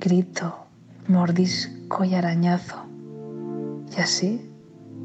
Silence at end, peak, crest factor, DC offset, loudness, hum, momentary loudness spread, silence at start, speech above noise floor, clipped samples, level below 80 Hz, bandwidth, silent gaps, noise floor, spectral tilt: 0 s; -8 dBFS; 16 dB; under 0.1%; -24 LUFS; none; 17 LU; 0 s; 21 dB; under 0.1%; -68 dBFS; 8.4 kHz; none; -43 dBFS; -5.5 dB/octave